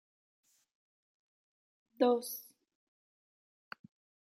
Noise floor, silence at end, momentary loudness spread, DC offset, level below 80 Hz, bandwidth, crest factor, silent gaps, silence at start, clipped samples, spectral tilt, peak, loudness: under -90 dBFS; 1.9 s; 22 LU; under 0.1%; under -90 dBFS; 16 kHz; 26 dB; none; 2 s; under 0.1%; -3.5 dB/octave; -16 dBFS; -33 LUFS